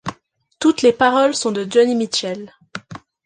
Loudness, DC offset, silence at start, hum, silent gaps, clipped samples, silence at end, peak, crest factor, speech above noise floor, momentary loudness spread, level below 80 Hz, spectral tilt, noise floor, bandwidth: -17 LUFS; under 0.1%; 0.05 s; none; none; under 0.1%; 0.3 s; -2 dBFS; 16 dB; 35 dB; 19 LU; -60 dBFS; -3.5 dB/octave; -51 dBFS; 10 kHz